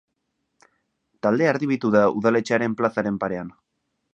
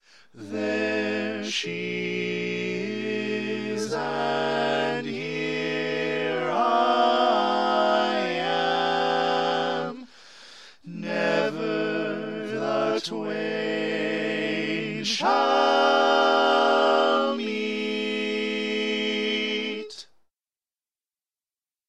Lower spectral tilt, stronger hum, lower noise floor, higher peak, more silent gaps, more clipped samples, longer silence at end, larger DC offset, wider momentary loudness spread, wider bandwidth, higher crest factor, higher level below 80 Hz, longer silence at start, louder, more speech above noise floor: first, -7 dB/octave vs -4 dB/octave; neither; second, -76 dBFS vs under -90 dBFS; first, -4 dBFS vs -8 dBFS; neither; neither; second, 0.65 s vs 1.85 s; second, under 0.1% vs 0.2%; about the same, 9 LU vs 10 LU; second, 8.4 kHz vs 11.5 kHz; about the same, 20 dB vs 18 dB; first, -62 dBFS vs -78 dBFS; first, 1.25 s vs 0.35 s; first, -22 LUFS vs -25 LUFS; second, 55 dB vs over 62 dB